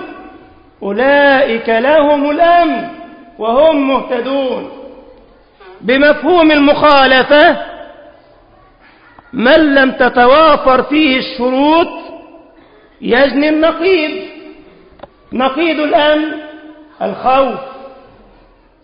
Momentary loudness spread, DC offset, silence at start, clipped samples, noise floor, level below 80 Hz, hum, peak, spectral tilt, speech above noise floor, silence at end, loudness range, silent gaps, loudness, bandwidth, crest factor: 18 LU; under 0.1%; 0 s; under 0.1%; -46 dBFS; -44 dBFS; none; 0 dBFS; -7.5 dB/octave; 36 dB; 0.9 s; 5 LU; none; -10 LUFS; 5.4 kHz; 12 dB